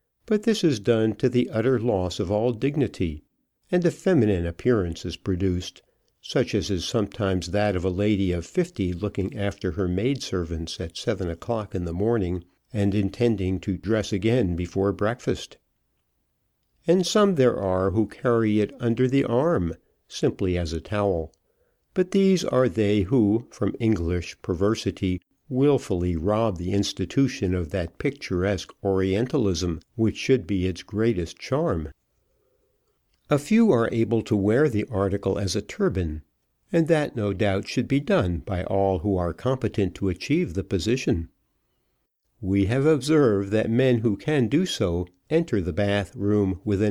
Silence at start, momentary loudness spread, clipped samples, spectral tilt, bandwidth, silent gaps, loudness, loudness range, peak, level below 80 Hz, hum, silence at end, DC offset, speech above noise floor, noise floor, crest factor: 0.3 s; 8 LU; under 0.1%; -6.5 dB/octave; 13.5 kHz; none; -24 LUFS; 4 LU; -8 dBFS; -46 dBFS; none; 0 s; under 0.1%; 50 dB; -73 dBFS; 16 dB